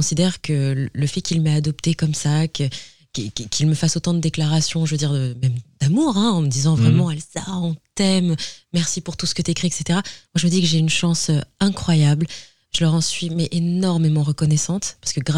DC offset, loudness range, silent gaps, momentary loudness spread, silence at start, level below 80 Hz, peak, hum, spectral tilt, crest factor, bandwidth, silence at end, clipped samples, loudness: 0.8%; 2 LU; none; 8 LU; 0 s; -48 dBFS; -4 dBFS; none; -5 dB/octave; 16 dB; 11.5 kHz; 0 s; under 0.1%; -20 LUFS